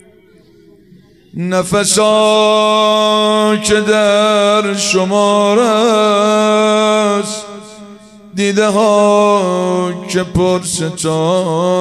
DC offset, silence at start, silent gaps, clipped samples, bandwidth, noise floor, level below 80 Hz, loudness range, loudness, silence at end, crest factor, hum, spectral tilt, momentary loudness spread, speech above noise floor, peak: under 0.1%; 1.35 s; none; under 0.1%; 15 kHz; -45 dBFS; -44 dBFS; 3 LU; -12 LUFS; 0 s; 12 dB; none; -4 dB/octave; 8 LU; 33 dB; 0 dBFS